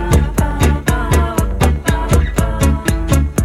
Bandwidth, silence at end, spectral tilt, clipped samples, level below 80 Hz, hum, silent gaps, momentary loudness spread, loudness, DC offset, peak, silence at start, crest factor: 16 kHz; 0 s; -6 dB/octave; under 0.1%; -18 dBFS; none; none; 3 LU; -15 LUFS; under 0.1%; -2 dBFS; 0 s; 12 dB